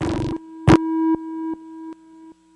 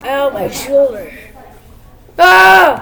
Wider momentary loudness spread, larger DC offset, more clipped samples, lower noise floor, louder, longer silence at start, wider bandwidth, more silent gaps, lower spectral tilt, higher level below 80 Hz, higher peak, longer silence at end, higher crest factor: second, 21 LU vs 24 LU; neither; second, under 0.1% vs 1%; first, -46 dBFS vs -39 dBFS; second, -20 LUFS vs -9 LUFS; about the same, 0 s vs 0.05 s; second, 11 kHz vs over 20 kHz; neither; first, -7.5 dB/octave vs -2.5 dB/octave; about the same, -40 dBFS vs -40 dBFS; about the same, -2 dBFS vs 0 dBFS; first, 0.25 s vs 0 s; first, 18 dB vs 12 dB